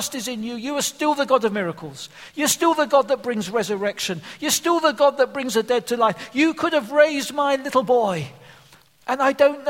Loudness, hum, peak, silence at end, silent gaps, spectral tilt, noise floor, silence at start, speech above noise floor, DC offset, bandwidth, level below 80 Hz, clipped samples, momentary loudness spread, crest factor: -21 LUFS; none; -2 dBFS; 0 s; none; -3 dB/octave; -52 dBFS; 0 s; 31 dB; under 0.1%; 16.5 kHz; -66 dBFS; under 0.1%; 10 LU; 20 dB